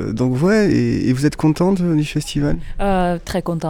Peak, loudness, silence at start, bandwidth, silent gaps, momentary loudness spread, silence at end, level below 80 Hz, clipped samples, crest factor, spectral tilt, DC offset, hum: -4 dBFS; -18 LUFS; 0 s; 17 kHz; none; 7 LU; 0 s; -30 dBFS; under 0.1%; 12 dB; -7 dB/octave; under 0.1%; none